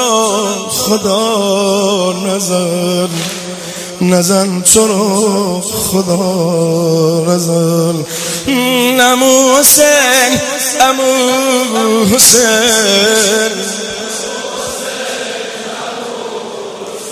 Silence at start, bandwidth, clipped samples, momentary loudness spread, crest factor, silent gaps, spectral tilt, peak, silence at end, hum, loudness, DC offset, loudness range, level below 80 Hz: 0 s; 16 kHz; 0.3%; 15 LU; 12 dB; none; -3 dB/octave; 0 dBFS; 0 s; none; -10 LUFS; under 0.1%; 6 LU; -46 dBFS